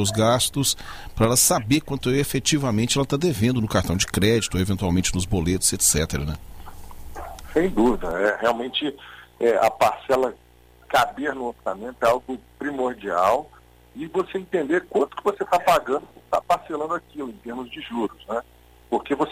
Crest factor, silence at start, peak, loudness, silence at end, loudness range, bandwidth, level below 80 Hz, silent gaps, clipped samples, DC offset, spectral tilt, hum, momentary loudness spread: 16 dB; 0 s; -6 dBFS; -22 LUFS; 0 s; 4 LU; 16 kHz; -42 dBFS; none; under 0.1%; under 0.1%; -4 dB/octave; none; 12 LU